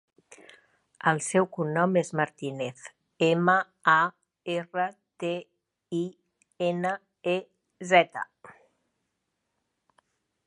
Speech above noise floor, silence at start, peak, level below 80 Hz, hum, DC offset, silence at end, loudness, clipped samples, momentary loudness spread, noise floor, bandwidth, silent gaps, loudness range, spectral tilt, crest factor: 54 dB; 0.3 s; -6 dBFS; -78 dBFS; none; under 0.1%; 1.95 s; -27 LUFS; under 0.1%; 15 LU; -80 dBFS; 11.5 kHz; none; 6 LU; -5 dB/octave; 24 dB